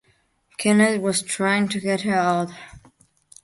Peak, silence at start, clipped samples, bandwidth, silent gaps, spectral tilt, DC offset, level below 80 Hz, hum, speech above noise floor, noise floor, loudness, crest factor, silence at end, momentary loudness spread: -4 dBFS; 0.6 s; under 0.1%; 11.5 kHz; none; -4.5 dB/octave; under 0.1%; -62 dBFS; none; 43 dB; -64 dBFS; -21 LUFS; 18 dB; 0.65 s; 12 LU